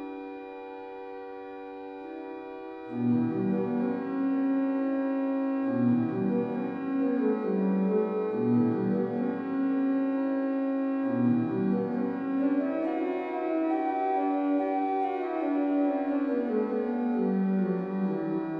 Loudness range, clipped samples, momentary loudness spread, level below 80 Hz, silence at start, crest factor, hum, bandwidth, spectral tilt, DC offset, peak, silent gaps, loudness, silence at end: 3 LU; under 0.1%; 14 LU; -74 dBFS; 0 s; 14 dB; none; 5 kHz; -10.5 dB/octave; under 0.1%; -14 dBFS; none; -28 LUFS; 0 s